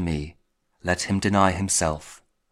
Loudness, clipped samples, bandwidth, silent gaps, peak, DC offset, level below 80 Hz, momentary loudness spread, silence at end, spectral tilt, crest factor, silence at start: -23 LUFS; under 0.1%; 15.5 kHz; none; -4 dBFS; under 0.1%; -44 dBFS; 14 LU; 0.35 s; -4 dB/octave; 22 dB; 0 s